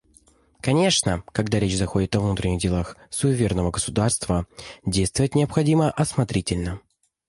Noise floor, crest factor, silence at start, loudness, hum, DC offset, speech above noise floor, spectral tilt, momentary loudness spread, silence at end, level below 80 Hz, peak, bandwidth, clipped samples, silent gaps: -57 dBFS; 18 dB; 0.65 s; -23 LUFS; none; under 0.1%; 35 dB; -5 dB/octave; 8 LU; 0.5 s; -38 dBFS; -6 dBFS; 11.5 kHz; under 0.1%; none